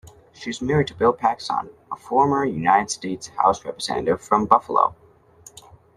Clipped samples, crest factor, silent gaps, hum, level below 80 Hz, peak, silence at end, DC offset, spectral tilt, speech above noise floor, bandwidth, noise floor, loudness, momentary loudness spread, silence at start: under 0.1%; 22 dB; none; none; -54 dBFS; -2 dBFS; 1.05 s; under 0.1%; -5 dB/octave; 29 dB; 13 kHz; -50 dBFS; -21 LUFS; 11 LU; 0.4 s